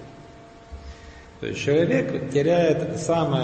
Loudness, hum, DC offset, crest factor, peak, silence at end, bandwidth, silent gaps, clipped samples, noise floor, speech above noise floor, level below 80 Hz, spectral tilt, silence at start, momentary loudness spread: -22 LUFS; none; under 0.1%; 16 dB; -8 dBFS; 0 s; 8.8 kHz; none; under 0.1%; -45 dBFS; 24 dB; -48 dBFS; -6 dB/octave; 0 s; 23 LU